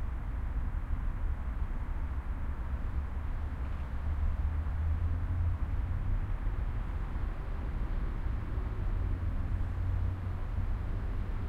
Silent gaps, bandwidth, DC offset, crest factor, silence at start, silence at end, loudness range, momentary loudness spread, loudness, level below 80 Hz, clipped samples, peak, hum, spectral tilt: none; 4.6 kHz; under 0.1%; 12 dB; 0 s; 0 s; 3 LU; 5 LU; -37 LUFS; -34 dBFS; under 0.1%; -20 dBFS; none; -9 dB/octave